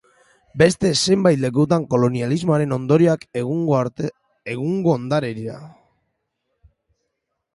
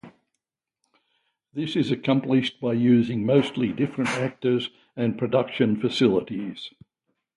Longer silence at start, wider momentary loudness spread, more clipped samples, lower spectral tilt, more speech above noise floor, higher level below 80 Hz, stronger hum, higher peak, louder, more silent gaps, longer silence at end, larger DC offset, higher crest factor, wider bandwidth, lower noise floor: first, 0.55 s vs 0.05 s; about the same, 14 LU vs 12 LU; neither; about the same, -6 dB/octave vs -7 dB/octave; about the same, 58 dB vs 59 dB; first, -54 dBFS vs -64 dBFS; neither; first, -2 dBFS vs -6 dBFS; first, -19 LUFS vs -24 LUFS; neither; first, 1.85 s vs 0.7 s; neither; about the same, 20 dB vs 18 dB; about the same, 11.5 kHz vs 11.5 kHz; second, -76 dBFS vs -83 dBFS